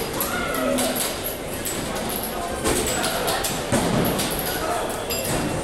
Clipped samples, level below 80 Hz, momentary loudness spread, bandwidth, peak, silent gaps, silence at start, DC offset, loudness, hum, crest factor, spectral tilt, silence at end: under 0.1%; -40 dBFS; 5 LU; 18 kHz; -8 dBFS; none; 0 s; under 0.1%; -23 LUFS; none; 16 dB; -3.5 dB/octave; 0 s